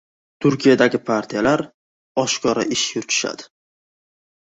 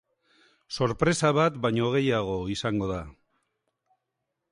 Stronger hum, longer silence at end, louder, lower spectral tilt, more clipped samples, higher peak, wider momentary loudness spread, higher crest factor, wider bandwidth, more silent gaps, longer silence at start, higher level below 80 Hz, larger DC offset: neither; second, 1.05 s vs 1.4 s; first, -19 LUFS vs -26 LUFS; second, -3.5 dB/octave vs -5.5 dB/octave; neither; first, -2 dBFS vs -10 dBFS; about the same, 11 LU vs 11 LU; about the same, 20 dB vs 18 dB; second, 8.2 kHz vs 11.5 kHz; first, 1.74-2.15 s vs none; second, 0.4 s vs 0.7 s; second, -58 dBFS vs -52 dBFS; neither